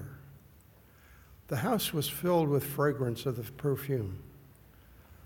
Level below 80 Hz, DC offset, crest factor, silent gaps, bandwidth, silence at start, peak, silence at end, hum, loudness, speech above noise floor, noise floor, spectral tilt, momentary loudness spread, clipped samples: -60 dBFS; under 0.1%; 18 dB; none; 17.5 kHz; 0 s; -16 dBFS; 0 s; none; -32 LUFS; 28 dB; -58 dBFS; -5.5 dB/octave; 12 LU; under 0.1%